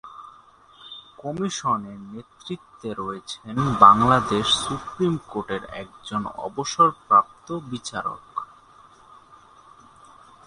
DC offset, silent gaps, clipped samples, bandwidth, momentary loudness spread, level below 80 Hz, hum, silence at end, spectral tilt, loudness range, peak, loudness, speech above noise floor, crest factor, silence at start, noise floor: under 0.1%; none; under 0.1%; 11 kHz; 23 LU; -54 dBFS; none; 2.05 s; -4.5 dB/octave; 11 LU; 0 dBFS; -22 LUFS; 29 dB; 24 dB; 0.05 s; -52 dBFS